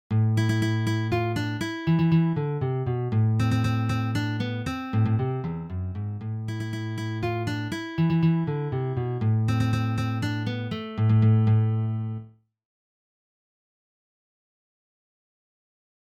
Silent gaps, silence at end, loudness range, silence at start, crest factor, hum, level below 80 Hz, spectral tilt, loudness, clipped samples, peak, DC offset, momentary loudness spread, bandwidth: none; 3.9 s; 5 LU; 0.1 s; 14 dB; none; -52 dBFS; -7.5 dB/octave; -26 LUFS; under 0.1%; -12 dBFS; under 0.1%; 10 LU; 8.8 kHz